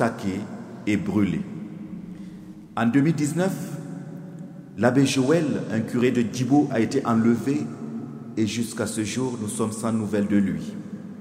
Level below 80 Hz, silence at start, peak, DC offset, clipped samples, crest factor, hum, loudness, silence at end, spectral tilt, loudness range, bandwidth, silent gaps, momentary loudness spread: -60 dBFS; 0 s; -4 dBFS; under 0.1%; under 0.1%; 20 dB; none; -24 LUFS; 0 s; -6 dB/octave; 4 LU; 16 kHz; none; 17 LU